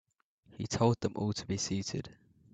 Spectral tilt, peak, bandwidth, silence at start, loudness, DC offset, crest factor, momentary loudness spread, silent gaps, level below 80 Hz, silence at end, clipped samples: -5 dB/octave; -14 dBFS; 9 kHz; 0.5 s; -34 LUFS; under 0.1%; 22 dB; 13 LU; none; -62 dBFS; 0.4 s; under 0.1%